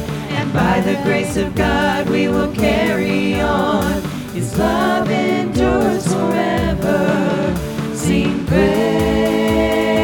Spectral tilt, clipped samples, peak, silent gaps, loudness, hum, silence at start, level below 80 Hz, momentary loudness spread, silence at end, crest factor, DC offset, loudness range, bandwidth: -6 dB/octave; under 0.1%; -2 dBFS; none; -17 LUFS; none; 0 s; -32 dBFS; 5 LU; 0 s; 14 dB; under 0.1%; 1 LU; 18 kHz